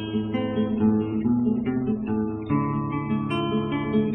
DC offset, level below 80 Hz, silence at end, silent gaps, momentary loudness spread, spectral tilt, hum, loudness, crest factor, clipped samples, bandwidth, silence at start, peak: under 0.1%; -50 dBFS; 0 s; none; 4 LU; -7 dB/octave; none; -25 LUFS; 14 dB; under 0.1%; 3.9 kHz; 0 s; -10 dBFS